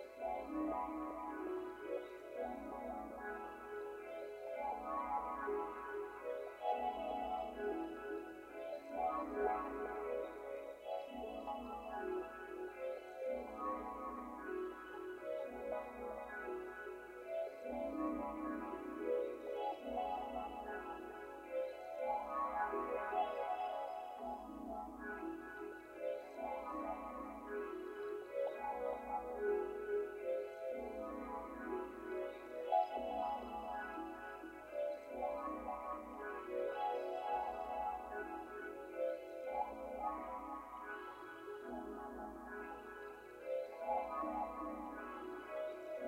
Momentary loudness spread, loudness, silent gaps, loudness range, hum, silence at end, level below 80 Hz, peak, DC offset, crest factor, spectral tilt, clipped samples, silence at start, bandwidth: 8 LU; -44 LUFS; none; 4 LU; none; 0 s; -68 dBFS; -24 dBFS; under 0.1%; 20 dB; -5.5 dB/octave; under 0.1%; 0 s; 16 kHz